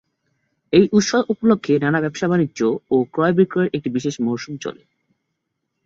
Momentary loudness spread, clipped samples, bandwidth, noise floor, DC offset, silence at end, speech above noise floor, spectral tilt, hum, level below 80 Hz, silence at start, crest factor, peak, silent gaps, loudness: 8 LU; under 0.1%; 7.8 kHz; -76 dBFS; under 0.1%; 1.1 s; 58 dB; -6 dB/octave; none; -56 dBFS; 0.7 s; 18 dB; -2 dBFS; none; -19 LUFS